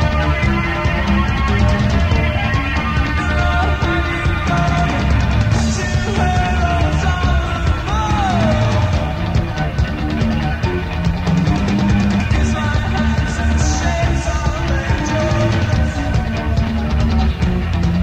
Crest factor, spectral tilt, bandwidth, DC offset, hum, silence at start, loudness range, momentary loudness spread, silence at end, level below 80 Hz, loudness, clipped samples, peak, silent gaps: 14 dB; -6 dB/octave; 9 kHz; under 0.1%; none; 0 s; 1 LU; 3 LU; 0 s; -20 dBFS; -17 LUFS; under 0.1%; -2 dBFS; none